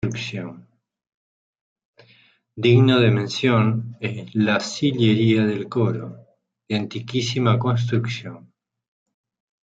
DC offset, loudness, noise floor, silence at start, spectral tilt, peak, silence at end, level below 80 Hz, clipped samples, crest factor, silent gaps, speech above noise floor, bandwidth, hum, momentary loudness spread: under 0.1%; -21 LUFS; -57 dBFS; 0.05 s; -6.5 dB/octave; -4 dBFS; 1.25 s; -60 dBFS; under 0.1%; 18 dB; 1.14-1.53 s, 1.61-1.76 s, 1.85-1.93 s; 37 dB; 7.8 kHz; none; 14 LU